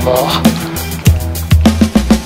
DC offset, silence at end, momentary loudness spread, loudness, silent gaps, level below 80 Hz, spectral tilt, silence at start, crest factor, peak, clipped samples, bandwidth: under 0.1%; 0 s; 7 LU; -12 LUFS; none; -20 dBFS; -5.5 dB/octave; 0 s; 12 dB; 0 dBFS; 0.6%; 16.5 kHz